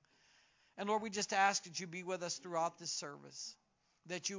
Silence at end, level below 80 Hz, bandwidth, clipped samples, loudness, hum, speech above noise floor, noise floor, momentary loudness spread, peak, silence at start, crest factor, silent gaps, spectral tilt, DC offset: 0 s; -86 dBFS; 7.8 kHz; under 0.1%; -39 LUFS; none; 32 dB; -71 dBFS; 15 LU; -18 dBFS; 0.75 s; 22 dB; none; -2 dB/octave; under 0.1%